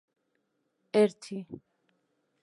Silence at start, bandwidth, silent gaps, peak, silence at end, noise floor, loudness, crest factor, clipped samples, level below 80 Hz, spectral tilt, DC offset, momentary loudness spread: 0.95 s; 11.5 kHz; none; -12 dBFS; 0.85 s; -78 dBFS; -27 LUFS; 22 dB; under 0.1%; -78 dBFS; -6 dB/octave; under 0.1%; 21 LU